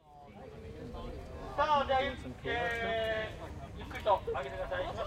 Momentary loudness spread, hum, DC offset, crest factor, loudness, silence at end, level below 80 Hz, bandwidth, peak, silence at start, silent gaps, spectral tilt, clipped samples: 17 LU; none; under 0.1%; 20 dB; -34 LUFS; 0 s; -50 dBFS; 16 kHz; -16 dBFS; 0.05 s; none; -5.5 dB/octave; under 0.1%